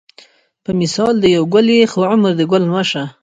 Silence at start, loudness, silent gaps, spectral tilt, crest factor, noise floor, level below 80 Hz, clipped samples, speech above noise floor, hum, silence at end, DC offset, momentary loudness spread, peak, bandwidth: 0.7 s; -14 LUFS; none; -5.5 dB/octave; 14 dB; -47 dBFS; -52 dBFS; under 0.1%; 34 dB; none; 0.1 s; under 0.1%; 7 LU; 0 dBFS; 9.4 kHz